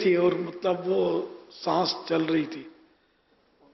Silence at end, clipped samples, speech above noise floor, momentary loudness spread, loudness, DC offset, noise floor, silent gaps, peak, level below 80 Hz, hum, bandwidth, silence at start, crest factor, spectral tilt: 1.05 s; under 0.1%; 40 dB; 11 LU; -27 LUFS; under 0.1%; -66 dBFS; none; -12 dBFS; -70 dBFS; none; 6.2 kHz; 0 s; 14 dB; -6.5 dB/octave